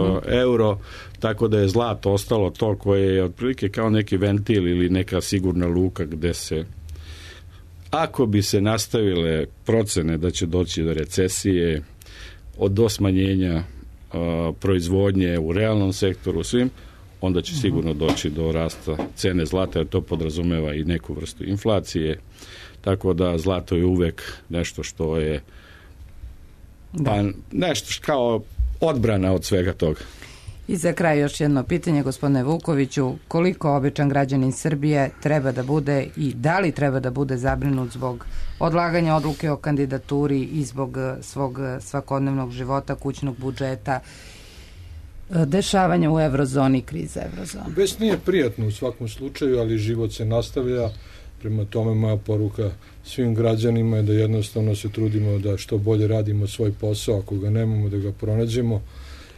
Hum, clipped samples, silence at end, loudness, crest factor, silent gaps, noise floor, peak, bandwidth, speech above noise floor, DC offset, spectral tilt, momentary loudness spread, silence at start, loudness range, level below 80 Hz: none; under 0.1%; 0.05 s; -23 LUFS; 14 dB; none; -44 dBFS; -8 dBFS; 13.5 kHz; 23 dB; under 0.1%; -6.5 dB/octave; 10 LU; 0 s; 4 LU; -40 dBFS